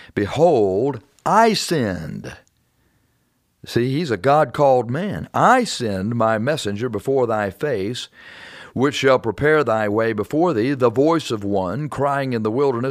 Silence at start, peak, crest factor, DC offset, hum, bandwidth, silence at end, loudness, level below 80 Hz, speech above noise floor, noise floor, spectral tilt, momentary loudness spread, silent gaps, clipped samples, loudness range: 0 s; -2 dBFS; 18 dB; under 0.1%; none; 15.5 kHz; 0 s; -19 LUFS; -54 dBFS; 47 dB; -65 dBFS; -5.5 dB/octave; 11 LU; none; under 0.1%; 3 LU